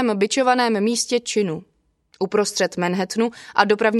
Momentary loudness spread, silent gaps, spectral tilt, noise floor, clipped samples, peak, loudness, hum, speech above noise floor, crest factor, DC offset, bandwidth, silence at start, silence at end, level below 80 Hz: 6 LU; none; -4 dB/octave; -60 dBFS; under 0.1%; 0 dBFS; -20 LUFS; none; 40 dB; 20 dB; under 0.1%; 13 kHz; 0 s; 0 s; -66 dBFS